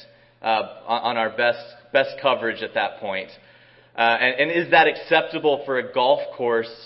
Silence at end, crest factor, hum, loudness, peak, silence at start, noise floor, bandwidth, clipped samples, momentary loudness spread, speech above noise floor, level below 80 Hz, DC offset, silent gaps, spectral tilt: 0 s; 20 dB; none; -21 LUFS; -2 dBFS; 0.4 s; -52 dBFS; 5.8 kHz; under 0.1%; 12 LU; 30 dB; -68 dBFS; under 0.1%; none; -8.5 dB/octave